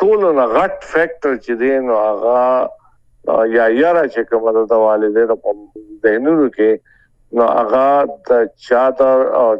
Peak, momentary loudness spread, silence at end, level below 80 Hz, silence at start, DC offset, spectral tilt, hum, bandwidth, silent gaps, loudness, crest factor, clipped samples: 0 dBFS; 6 LU; 0 s; -52 dBFS; 0 s; under 0.1%; -7 dB/octave; none; 7.8 kHz; none; -14 LUFS; 14 dB; under 0.1%